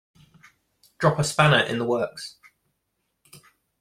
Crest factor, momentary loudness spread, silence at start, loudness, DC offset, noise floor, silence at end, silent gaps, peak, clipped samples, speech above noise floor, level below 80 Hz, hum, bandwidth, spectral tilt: 24 dB; 17 LU; 1 s; -22 LUFS; under 0.1%; -76 dBFS; 1.5 s; none; -2 dBFS; under 0.1%; 55 dB; -58 dBFS; none; 15 kHz; -4.5 dB/octave